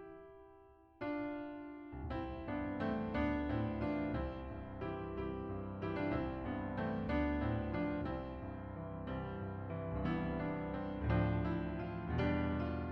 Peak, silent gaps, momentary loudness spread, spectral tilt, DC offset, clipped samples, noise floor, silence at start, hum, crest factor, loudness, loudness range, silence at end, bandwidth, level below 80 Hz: -22 dBFS; none; 10 LU; -9.5 dB/octave; under 0.1%; under 0.1%; -62 dBFS; 0 s; none; 16 dB; -40 LUFS; 3 LU; 0 s; 6 kHz; -50 dBFS